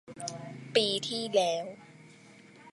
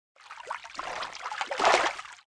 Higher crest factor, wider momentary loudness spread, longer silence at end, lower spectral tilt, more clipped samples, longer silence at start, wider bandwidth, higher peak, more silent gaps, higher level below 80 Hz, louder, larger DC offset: about the same, 22 dB vs 24 dB; about the same, 16 LU vs 17 LU; about the same, 0 s vs 0.1 s; first, -3 dB/octave vs -1 dB/octave; neither; second, 0.05 s vs 0.2 s; about the same, 11.5 kHz vs 11 kHz; second, -12 dBFS vs -8 dBFS; neither; second, -80 dBFS vs -66 dBFS; about the same, -30 LUFS vs -29 LUFS; neither